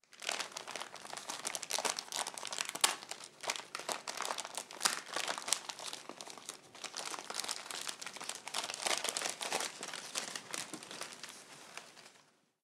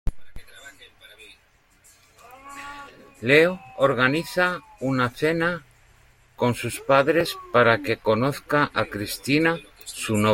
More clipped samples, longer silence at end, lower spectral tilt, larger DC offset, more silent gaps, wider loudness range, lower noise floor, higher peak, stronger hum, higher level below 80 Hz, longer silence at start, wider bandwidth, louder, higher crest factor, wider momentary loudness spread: neither; first, 0.4 s vs 0 s; second, 1 dB/octave vs -5 dB/octave; neither; neither; about the same, 4 LU vs 4 LU; first, -68 dBFS vs -60 dBFS; about the same, -2 dBFS vs -4 dBFS; neither; second, under -90 dBFS vs -44 dBFS; about the same, 0.1 s vs 0.05 s; about the same, 17.5 kHz vs 16.5 kHz; second, -39 LUFS vs -22 LUFS; first, 38 dB vs 20 dB; second, 14 LU vs 18 LU